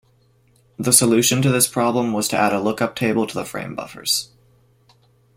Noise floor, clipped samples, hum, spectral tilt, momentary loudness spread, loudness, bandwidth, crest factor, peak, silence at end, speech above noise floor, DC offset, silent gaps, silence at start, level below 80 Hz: -58 dBFS; under 0.1%; none; -3.5 dB/octave; 14 LU; -18 LUFS; 16.5 kHz; 20 dB; 0 dBFS; 1.1 s; 39 dB; under 0.1%; none; 0.8 s; -56 dBFS